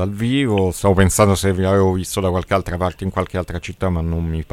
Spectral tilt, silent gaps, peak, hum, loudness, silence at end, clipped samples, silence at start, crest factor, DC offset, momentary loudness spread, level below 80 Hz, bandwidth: -5.5 dB/octave; none; -2 dBFS; none; -18 LUFS; 0.05 s; under 0.1%; 0 s; 16 dB; under 0.1%; 8 LU; -34 dBFS; 15 kHz